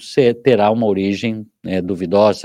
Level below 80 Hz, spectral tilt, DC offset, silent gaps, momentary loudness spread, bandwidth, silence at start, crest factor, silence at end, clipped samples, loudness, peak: -60 dBFS; -6.5 dB/octave; under 0.1%; none; 10 LU; 11.5 kHz; 0 s; 14 dB; 0 s; under 0.1%; -16 LUFS; 0 dBFS